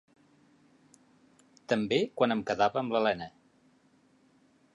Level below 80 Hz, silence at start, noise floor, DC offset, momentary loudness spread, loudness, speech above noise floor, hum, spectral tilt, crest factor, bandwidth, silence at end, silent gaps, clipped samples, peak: -70 dBFS; 1.7 s; -65 dBFS; under 0.1%; 11 LU; -29 LUFS; 37 dB; none; -5.5 dB/octave; 22 dB; 11 kHz; 1.45 s; none; under 0.1%; -12 dBFS